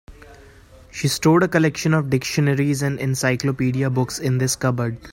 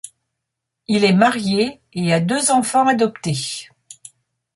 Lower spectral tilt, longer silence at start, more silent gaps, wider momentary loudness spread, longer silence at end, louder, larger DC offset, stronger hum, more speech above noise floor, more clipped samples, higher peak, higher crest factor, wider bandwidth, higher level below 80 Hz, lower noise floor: about the same, -5.5 dB/octave vs -4.5 dB/octave; about the same, 0.1 s vs 0.05 s; neither; second, 6 LU vs 9 LU; second, 0 s vs 0.9 s; about the same, -20 LUFS vs -18 LUFS; neither; neither; second, 27 dB vs 63 dB; neither; about the same, -2 dBFS vs -2 dBFS; about the same, 18 dB vs 18 dB; first, 16.5 kHz vs 11.5 kHz; first, -50 dBFS vs -58 dBFS; second, -46 dBFS vs -80 dBFS